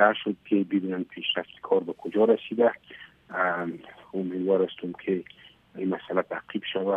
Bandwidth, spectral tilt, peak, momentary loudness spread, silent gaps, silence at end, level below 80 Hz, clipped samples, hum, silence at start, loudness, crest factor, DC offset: 3.9 kHz; -8 dB/octave; -4 dBFS; 14 LU; none; 0 s; -72 dBFS; under 0.1%; none; 0 s; -28 LUFS; 22 dB; under 0.1%